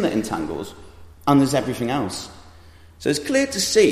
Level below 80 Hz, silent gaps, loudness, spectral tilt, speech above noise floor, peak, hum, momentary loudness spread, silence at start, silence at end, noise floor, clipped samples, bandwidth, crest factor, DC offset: -50 dBFS; none; -22 LUFS; -4.5 dB/octave; 26 dB; -4 dBFS; none; 15 LU; 0 s; 0 s; -46 dBFS; under 0.1%; 15 kHz; 18 dB; under 0.1%